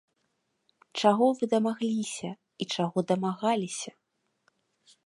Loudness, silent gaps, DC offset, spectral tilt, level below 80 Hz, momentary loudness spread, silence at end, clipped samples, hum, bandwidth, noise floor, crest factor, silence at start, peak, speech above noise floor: -28 LUFS; none; under 0.1%; -5 dB/octave; -78 dBFS; 14 LU; 1.15 s; under 0.1%; none; 11.5 kHz; -77 dBFS; 22 dB; 0.95 s; -8 dBFS; 49 dB